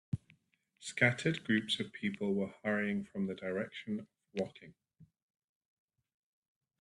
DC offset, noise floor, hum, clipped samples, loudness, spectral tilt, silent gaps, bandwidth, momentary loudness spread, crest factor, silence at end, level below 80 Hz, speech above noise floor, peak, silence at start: under 0.1%; -73 dBFS; none; under 0.1%; -36 LUFS; -5.5 dB/octave; none; 11.5 kHz; 13 LU; 26 dB; 1.75 s; -74 dBFS; 37 dB; -12 dBFS; 0.15 s